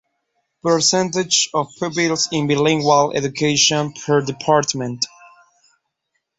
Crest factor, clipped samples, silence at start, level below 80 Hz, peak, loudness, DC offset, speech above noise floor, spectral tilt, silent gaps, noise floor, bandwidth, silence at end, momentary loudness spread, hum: 18 dB; under 0.1%; 0.65 s; -58 dBFS; -2 dBFS; -18 LUFS; under 0.1%; 56 dB; -3 dB/octave; none; -74 dBFS; 8.4 kHz; 1.3 s; 8 LU; none